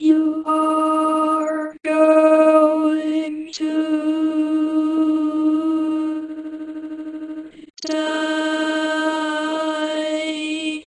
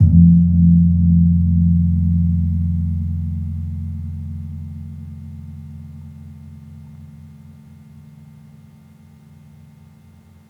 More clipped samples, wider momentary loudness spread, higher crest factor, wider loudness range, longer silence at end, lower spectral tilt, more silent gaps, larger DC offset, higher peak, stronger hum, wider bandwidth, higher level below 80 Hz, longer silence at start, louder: neither; second, 17 LU vs 26 LU; about the same, 16 dB vs 16 dB; second, 7 LU vs 25 LU; second, 0.2 s vs 3.25 s; second, -3 dB/octave vs -12 dB/octave; first, 7.70-7.74 s vs none; neither; about the same, -4 dBFS vs -2 dBFS; neither; first, 10.5 kHz vs 0.9 kHz; second, -70 dBFS vs -36 dBFS; about the same, 0 s vs 0 s; second, -19 LUFS vs -16 LUFS